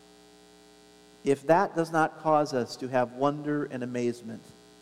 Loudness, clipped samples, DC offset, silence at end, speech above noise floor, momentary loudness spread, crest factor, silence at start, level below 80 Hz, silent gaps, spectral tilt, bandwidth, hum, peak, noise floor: -28 LUFS; under 0.1%; under 0.1%; 0.4 s; 28 dB; 10 LU; 20 dB; 1.25 s; -70 dBFS; none; -6 dB/octave; 14.5 kHz; none; -8 dBFS; -55 dBFS